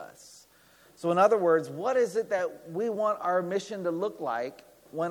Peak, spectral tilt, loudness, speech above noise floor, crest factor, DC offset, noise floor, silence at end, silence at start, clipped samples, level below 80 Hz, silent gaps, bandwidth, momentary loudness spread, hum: -8 dBFS; -5.5 dB/octave; -28 LUFS; 32 dB; 20 dB; under 0.1%; -59 dBFS; 0 s; 0 s; under 0.1%; -78 dBFS; none; 19 kHz; 11 LU; none